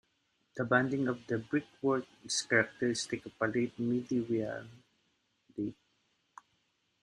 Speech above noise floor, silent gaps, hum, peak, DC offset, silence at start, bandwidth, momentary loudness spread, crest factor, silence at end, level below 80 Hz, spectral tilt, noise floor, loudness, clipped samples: 44 dB; none; none; -12 dBFS; under 0.1%; 0.55 s; 11 kHz; 11 LU; 24 dB; 1.3 s; -72 dBFS; -4.5 dB/octave; -77 dBFS; -33 LUFS; under 0.1%